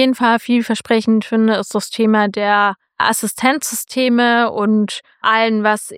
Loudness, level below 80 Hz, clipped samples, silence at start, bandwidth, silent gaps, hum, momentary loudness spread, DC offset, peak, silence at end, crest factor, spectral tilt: -16 LUFS; -66 dBFS; under 0.1%; 0 s; 16 kHz; none; none; 5 LU; under 0.1%; 0 dBFS; 0 s; 14 dB; -4 dB/octave